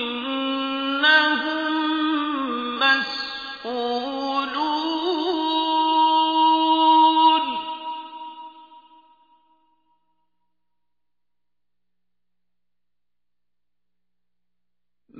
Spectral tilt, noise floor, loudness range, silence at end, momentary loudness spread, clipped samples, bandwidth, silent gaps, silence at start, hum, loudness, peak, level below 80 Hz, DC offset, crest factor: -3 dB/octave; -88 dBFS; 7 LU; 0 s; 15 LU; under 0.1%; 5 kHz; none; 0 s; 60 Hz at -55 dBFS; -20 LUFS; -6 dBFS; -68 dBFS; under 0.1%; 18 dB